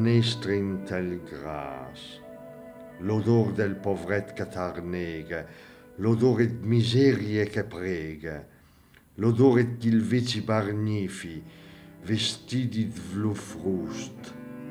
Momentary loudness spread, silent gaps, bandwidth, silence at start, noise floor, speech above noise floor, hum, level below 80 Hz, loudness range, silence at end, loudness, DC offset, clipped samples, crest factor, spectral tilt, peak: 20 LU; none; 12.5 kHz; 0 s; -57 dBFS; 30 dB; none; -58 dBFS; 5 LU; 0 s; -27 LUFS; under 0.1%; under 0.1%; 20 dB; -6.5 dB/octave; -8 dBFS